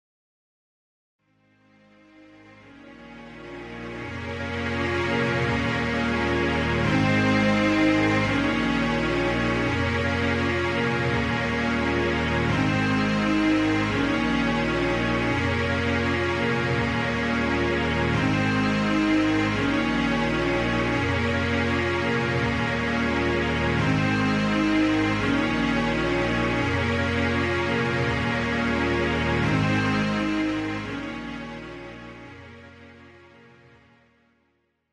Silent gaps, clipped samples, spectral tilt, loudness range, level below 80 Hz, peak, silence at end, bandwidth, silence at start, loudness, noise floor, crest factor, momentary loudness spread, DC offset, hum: none; under 0.1%; -6 dB/octave; 8 LU; -40 dBFS; -10 dBFS; 1.85 s; 11.5 kHz; 2.65 s; -23 LUFS; -71 dBFS; 14 dB; 10 LU; under 0.1%; none